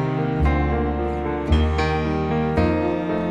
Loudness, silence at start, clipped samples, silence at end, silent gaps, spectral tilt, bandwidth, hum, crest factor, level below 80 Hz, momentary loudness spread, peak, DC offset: -22 LUFS; 0 s; under 0.1%; 0 s; none; -8 dB/octave; 7.6 kHz; none; 16 dB; -26 dBFS; 4 LU; -6 dBFS; under 0.1%